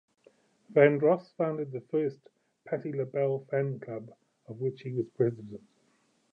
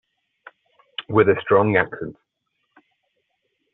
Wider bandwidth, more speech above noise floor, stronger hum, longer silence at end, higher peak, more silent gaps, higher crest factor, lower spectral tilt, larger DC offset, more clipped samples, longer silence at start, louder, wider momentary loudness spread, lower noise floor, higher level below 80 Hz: first, 5.4 kHz vs 4.1 kHz; second, 41 dB vs 56 dB; neither; second, 0.75 s vs 1.6 s; second, -8 dBFS vs -2 dBFS; neither; about the same, 22 dB vs 20 dB; first, -10 dB/octave vs -4.5 dB/octave; neither; neither; second, 0.7 s vs 1 s; second, -30 LUFS vs -19 LUFS; about the same, 18 LU vs 18 LU; second, -70 dBFS vs -74 dBFS; second, -78 dBFS vs -60 dBFS